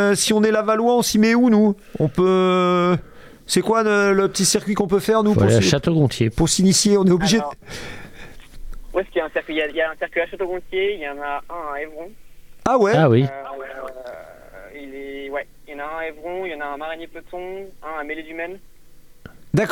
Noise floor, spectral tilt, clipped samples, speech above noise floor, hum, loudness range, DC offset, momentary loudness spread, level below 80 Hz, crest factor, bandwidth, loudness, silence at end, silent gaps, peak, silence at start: -43 dBFS; -5 dB/octave; under 0.1%; 24 dB; none; 14 LU; under 0.1%; 18 LU; -42 dBFS; 16 dB; 16.5 kHz; -19 LUFS; 0 s; none; -4 dBFS; 0 s